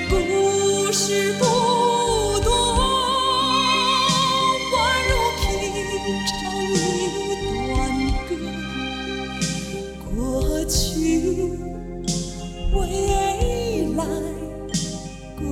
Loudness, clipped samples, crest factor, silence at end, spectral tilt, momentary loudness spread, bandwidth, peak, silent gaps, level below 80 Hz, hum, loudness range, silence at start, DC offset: -21 LUFS; under 0.1%; 16 dB; 0 s; -3.5 dB/octave; 10 LU; 17 kHz; -6 dBFS; none; -30 dBFS; none; 6 LU; 0 s; under 0.1%